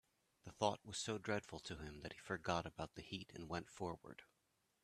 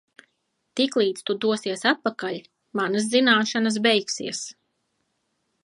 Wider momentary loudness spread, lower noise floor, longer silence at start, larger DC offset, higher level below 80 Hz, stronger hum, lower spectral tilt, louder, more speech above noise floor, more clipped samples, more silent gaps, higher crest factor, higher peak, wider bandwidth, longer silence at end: about the same, 13 LU vs 14 LU; first, -84 dBFS vs -74 dBFS; second, 0.45 s vs 0.75 s; neither; first, -70 dBFS vs -78 dBFS; neither; about the same, -4 dB/octave vs -3 dB/octave; second, -46 LUFS vs -23 LUFS; second, 37 dB vs 51 dB; neither; neither; first, 26 dB vs 20 dB; second, -22 dBFS vs -4 dBFS; first, 14 kHz vs 11.5 kHz; second, 0.6 s vs 1.1 s